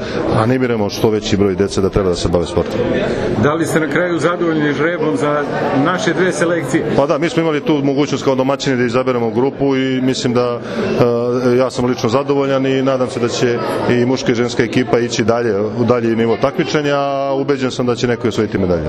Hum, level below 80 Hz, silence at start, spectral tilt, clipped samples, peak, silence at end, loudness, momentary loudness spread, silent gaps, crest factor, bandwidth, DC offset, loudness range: none; -40 dBFS; 0 s; -6 dB/octave; under 0.1%; 0 dBFS; 0 s; -15 LUFS; 3 LU; none; 14 dB; 13.5 kHz; under 0.1%; 1 LU